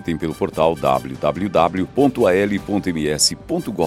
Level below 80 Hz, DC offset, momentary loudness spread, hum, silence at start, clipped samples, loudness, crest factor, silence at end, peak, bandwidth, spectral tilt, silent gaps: -44 dBFS; under 0.1%; 7 LU; none; 0 s; under 0.1%; -19 LUFS; 16 dB; 0 s; -2 dBFS; 16.5 kHz; -4.5 dB/octave; none